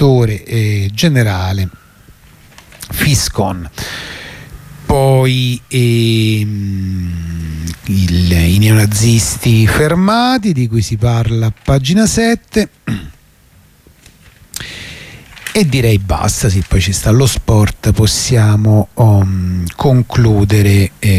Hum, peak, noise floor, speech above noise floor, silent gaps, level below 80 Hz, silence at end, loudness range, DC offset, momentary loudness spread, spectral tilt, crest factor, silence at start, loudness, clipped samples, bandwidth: none; 0 dBFS; -46 dBFS; 34 dB; none; -28 dBFS; 0 s; 7 LU; under 0.1%; 13 LU; -5.5 dB/octave; 12 dB; 0 s; -12 LUFS; under 0.1%; 15.5 kHz